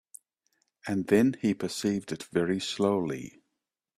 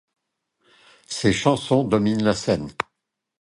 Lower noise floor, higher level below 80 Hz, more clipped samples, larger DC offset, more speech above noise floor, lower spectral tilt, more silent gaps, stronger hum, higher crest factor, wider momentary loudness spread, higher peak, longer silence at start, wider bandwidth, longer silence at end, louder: first, -84 dBFS vs -80 dBFS; second, -66 dBFS vs -50 dBFS; neither; neither; about the same, 56 dB vs 59 dB; about the same, -5.5 dB/octave vs -5.5 dB/octave; neither; neither; about the same, 20 dB vs 20 dB; about the same, 12 LU vs 12 LU; second, -10 dBFS vs -2 dBFS; second, 0.85 s vs 1.1 s; first, 14.5 kHz vs 11.5 kHz; about the same, 0.7 s vs 0.6 s; second, -29 LUFS vs -22 LUFS